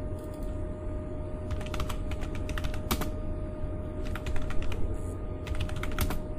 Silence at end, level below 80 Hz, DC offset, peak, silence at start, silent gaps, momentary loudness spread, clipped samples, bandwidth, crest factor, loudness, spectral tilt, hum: 0 s; -34 dBFS; under 0.1%; -12 dBFS; 0 s; none; 5 LU; under 0.1%; 15.5 kHz; 18 dB; -36 LUFS; -6 dB/octave; none